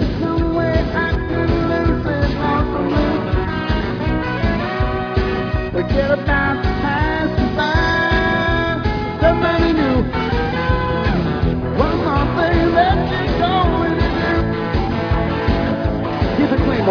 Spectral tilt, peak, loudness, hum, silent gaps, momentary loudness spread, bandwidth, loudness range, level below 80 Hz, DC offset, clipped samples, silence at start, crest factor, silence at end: -8 dB/octave; -2 dBFS; -18 LUFS; none; none; 4 LU; 5.4 kHz; 2 LU; -24 dBFS; under 0.1%; under 0.1%; 0 s; 14 dB; 0 s